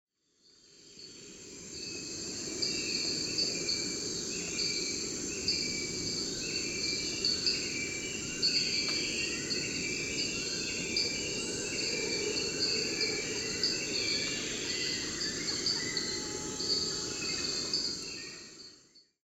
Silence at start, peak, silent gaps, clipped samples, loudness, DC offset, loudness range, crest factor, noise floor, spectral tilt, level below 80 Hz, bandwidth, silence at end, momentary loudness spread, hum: 0.7 s; -16 dBFS; none; under 0.1%; -32 LUFS; under 0.1%; 3 LU; 18 dB; -67 dBFS; -1 dB/octave; -60 dBFS; 16 kHz; 0.25 s; 9 LU; none